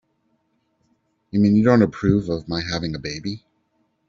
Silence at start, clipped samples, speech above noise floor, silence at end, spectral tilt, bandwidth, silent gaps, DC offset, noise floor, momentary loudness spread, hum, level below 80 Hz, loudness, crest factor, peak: 1.35 s; under 0.1%; 49 dB; 0.7 s; -7 dB/octave; 7.4 kHz; none; under 0.1%; -68 dBFS; 14 LU; none; -46 dBFS; -20 LUFS; 18 dB; -4 dBFS